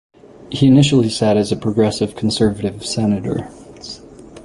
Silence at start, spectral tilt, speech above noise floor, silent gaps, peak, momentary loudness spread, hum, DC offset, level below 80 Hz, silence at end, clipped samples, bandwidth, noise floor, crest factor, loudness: 0.4 s; -6 dB/octave; 23 dB; none; -2 dBFS; 21 LU; none; under 0.1%; -44 dBFS; 0 s; under 0.1%; 11.5 kHz; -38 dBFS; 16 dB; -16 LUFS